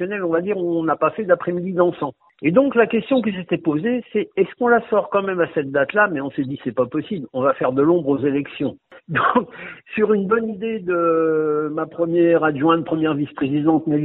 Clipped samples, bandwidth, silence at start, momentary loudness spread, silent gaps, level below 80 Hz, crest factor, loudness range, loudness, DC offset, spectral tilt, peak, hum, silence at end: under 0.1%; 4.1 kHz; 0 s; 8 LU; none; -60 dBFS; 18 dB; 2 LU; -20 LUFS; under 0.1%; -10.5 dB/octave; -2 dBFS; none; 0 s